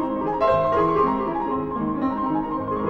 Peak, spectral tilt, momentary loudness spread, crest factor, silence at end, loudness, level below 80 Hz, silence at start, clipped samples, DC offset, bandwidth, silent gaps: -8 dBFS; -9 dB/octave; 6 LU; 14 dB; 0 s; -22 LUFS; -46 dBFS; 0 s; under 0.1%; under 0.1%; 7 kHz; none